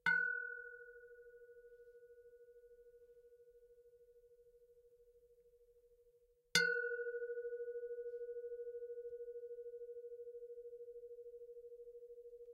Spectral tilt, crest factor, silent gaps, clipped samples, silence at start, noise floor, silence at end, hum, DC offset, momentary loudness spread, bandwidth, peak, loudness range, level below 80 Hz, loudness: -1 dB/octave; 32 dB; none; under 0.1%; 0.05 s; -73 dBFS; 0 s; none; under 0.1%; 27 LU; 15.5 kHz; -16 dBFS; 23 LU; -82 dBFS; -43 LUFS